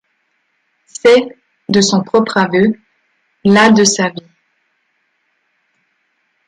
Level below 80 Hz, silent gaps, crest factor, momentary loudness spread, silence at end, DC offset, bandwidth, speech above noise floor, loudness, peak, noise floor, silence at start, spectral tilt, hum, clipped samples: -56 dBFS; none; 16 dB; 20 LU; 2.3 s; under 0.1%; 11.5 kHz; 53 dB; -12 LUFS; 0 dBFS; -64 dBFS; 1.05 s; -4 dB/octave; none; under 0.1%